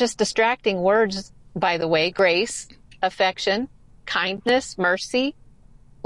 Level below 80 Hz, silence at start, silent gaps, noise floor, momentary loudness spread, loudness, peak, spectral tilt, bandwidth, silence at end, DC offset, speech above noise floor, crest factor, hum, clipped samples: -54 dBFS; 0 s; none; -51 dBFS; 9 LU; -22 LUFS; -8 dBFS; -3.5 dB/octave; 11.5 kHz; 0.75 s; 0.2%; 29 dB; 16 dB; none; under 0.1%